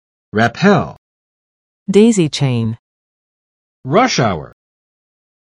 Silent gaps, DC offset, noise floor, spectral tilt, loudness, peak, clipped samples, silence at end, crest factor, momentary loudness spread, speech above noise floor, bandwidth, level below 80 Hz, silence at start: 0.98-1.86 s, 2.79-3.83 s; under 0.1%; under -90 dBFS; -5.5 dB/octave; -14 LUFS; 0 dBFS; under 0.1%; 1.05 s; 16 dB; 17 LU; over 77 dB; 11.5 kHz; -50 dBFS; 0.35 s